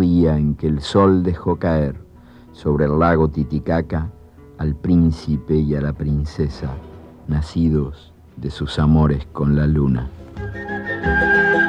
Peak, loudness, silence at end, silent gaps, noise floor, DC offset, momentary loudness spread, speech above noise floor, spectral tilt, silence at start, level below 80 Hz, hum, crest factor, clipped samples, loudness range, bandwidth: -4 dBFS; -19 LUFS; 0 s; none; -43 dBFS; under 0.1%; 14 LU; 26 dB; -8 dB/octave; 0 s; -30 dBFS; none; 16 dB; under 0.1%; 3 LU; 9.2 kHz